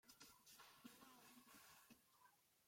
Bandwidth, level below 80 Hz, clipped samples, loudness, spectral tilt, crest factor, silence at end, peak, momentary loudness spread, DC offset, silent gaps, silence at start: 16.5 kHz; under -90 dBFS; under 0.1%; -66 LUFS; -1.5 dB/octave; 20 dB; 0 s; -48 dBFS; 2 LU; under 0.1%; none; 0.05 s